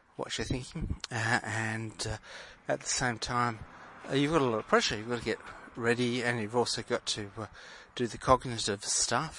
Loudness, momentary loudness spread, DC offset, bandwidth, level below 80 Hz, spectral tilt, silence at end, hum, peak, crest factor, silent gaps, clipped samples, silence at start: -31 LUFS; 16 LU; under 0.1%; 11.5 kHz; -52 dBFS; -3.5 dB/octave; 0 s; none; -8 dBFS; 24 dB; none; under 0.1%; 0.2 s